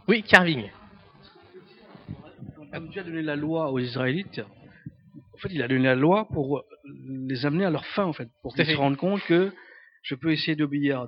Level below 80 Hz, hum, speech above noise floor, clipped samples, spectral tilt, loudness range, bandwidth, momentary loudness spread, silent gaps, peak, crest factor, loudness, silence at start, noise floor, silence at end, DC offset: -60 dBFS; none; 28 dB; under 0.1%; -6.5 dB/octave; 6 LU; 10.5 kHz; 22 LU; none; 0 dBFS; 26 dB; -25 LUFS; 0.1 s; -53 dBFS; 0 s; under 0.1%